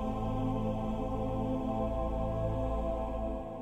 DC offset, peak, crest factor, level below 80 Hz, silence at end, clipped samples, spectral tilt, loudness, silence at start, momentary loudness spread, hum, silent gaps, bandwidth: under 0.1%; -20 dBFS; 12 dB; -38 dBFS; 0 s; under 0.1%; -9 dB/octave; -35 LUFS; 0 s; 2 LU; none; none; 8.8 kHz